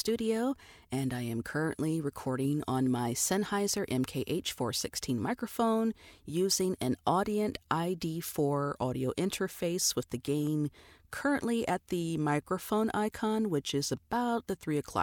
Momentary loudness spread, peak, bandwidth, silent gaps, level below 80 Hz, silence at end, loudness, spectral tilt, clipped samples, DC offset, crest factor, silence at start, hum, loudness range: 5 LU; -14 dBFS; 19.5 kHz; none; -62 dBFS; 0 s; -32 LUFS; -4.5 dB/octave; under 0.1%; under 0.1%; 18 dB; 0 s; none; 1 LU